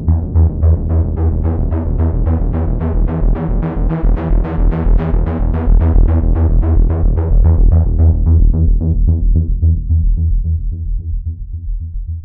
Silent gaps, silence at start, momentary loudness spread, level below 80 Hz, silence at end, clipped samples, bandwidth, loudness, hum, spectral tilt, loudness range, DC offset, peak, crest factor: none; 0 s; 10 LU; -14 dBFS; 0 s; under 0.1%; 2.6 kHz; -15 LUFS; none; -13.5 dB/octave; 4 LU; under 0.1%; 0 dBFS; 10 dB